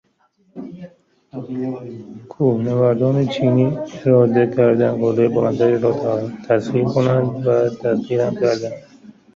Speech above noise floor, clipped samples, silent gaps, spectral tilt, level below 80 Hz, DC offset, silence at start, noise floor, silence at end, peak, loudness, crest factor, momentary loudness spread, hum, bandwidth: 43 dB; under 0.1%; none; -8.5 dB/octave; -56 dBFS; under 0.1%; 0.55 s; -60 dBFS; 0.25 s; -2 dBFS; -18 LUFS; 16 dB; 19 LU; none; 7.4 kHz